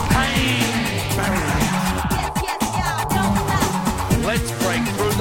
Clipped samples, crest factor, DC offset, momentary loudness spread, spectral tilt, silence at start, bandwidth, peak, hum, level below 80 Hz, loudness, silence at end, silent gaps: under 0.1%; 18 dB; under 0.1%; 4 LU; -4.5 dB/octave; 0 s; 17 kHz; -2 dBFS; none; -32 dBFS; -20 LUFS; 0 s; none